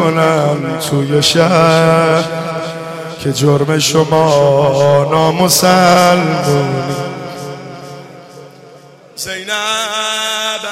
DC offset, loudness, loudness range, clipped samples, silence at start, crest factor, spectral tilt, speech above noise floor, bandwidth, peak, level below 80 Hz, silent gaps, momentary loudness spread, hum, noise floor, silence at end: under 0.1%; -12 LUFS; 10 LU; under 0.1%; 0 s; 12 dB; -4.5 dB/octave; 27 dB; 16.5 kHz; 0 dBFS; -50 dBFS; none; 16 LU; none; -39 dBFS; 0 s